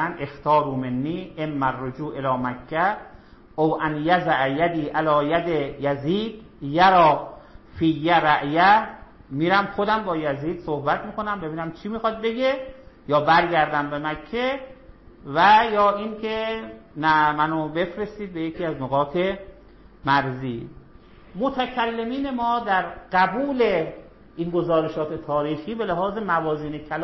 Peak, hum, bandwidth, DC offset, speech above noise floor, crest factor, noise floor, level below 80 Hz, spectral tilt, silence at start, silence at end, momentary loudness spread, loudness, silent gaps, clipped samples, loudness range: -6 dBFS; none; 6 kHz; under 0.1%; 26 dB; 16 dB; -48 dBFS; -50 dBFS; -7.5 dB/octave; 0 s; 0 s; 13 LU; -22 LUFS; none; under 0.1%; 6 LU